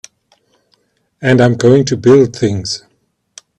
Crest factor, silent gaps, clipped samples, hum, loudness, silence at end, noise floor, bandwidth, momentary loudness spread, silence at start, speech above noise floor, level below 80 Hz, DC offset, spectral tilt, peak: 14 dB; none; under 0.1%; none; -12 LUFS; 0.8 s; -60 dBFS; 9.8 kHz; 11 LU; 1.2 s; 49 dB; -50 dBFS; under 0.1%; -6 dB/octave; 0 dBFS